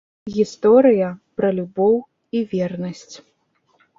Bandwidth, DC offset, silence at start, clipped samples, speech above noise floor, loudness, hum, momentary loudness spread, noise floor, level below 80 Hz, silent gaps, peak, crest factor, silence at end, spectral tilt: 7.6 kHz; under 0.1%; 0.25 s; under 0.1%; 46 dB; -19 LUFS; none; 15 LU; -64 dBFS; -62 dBFS; none; -2 dBFS; 18 dB; 0.8 s; -7.5 dB/octave